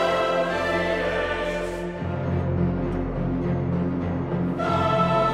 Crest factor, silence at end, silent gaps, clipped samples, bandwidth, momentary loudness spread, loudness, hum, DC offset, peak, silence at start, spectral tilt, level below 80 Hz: 16 dB; 0 s; none; under 0.1%; 11 kHz; 6 LU; -25 LUFS; none; under 0.1%; -8 dBFS; 0 s; -7 dB/octave; -40 dBFS